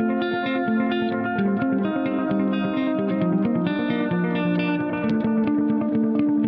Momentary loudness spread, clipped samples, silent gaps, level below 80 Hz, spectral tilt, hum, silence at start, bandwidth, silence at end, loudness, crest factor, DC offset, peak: 2 LU; under 0.1%; none; -60 dBFS; -6 dB/octave; none; 0 s; 5.2 kHz; 0 s; -23 LUFS; 12 dB; under 0.1%; -8 dBFS